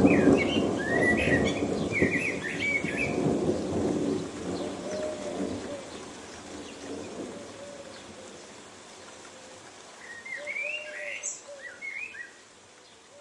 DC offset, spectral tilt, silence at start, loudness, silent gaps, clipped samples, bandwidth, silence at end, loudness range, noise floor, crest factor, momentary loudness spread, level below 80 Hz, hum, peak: under 0.1%; -5 dB/octave; 0 s; -29 LUFS; none; under 0.1%; 11.5 kHz; 0 s; 16 LU; -53 dBFS; 22 dB; 21 LU; -56 dBFS; none; -8 dBFS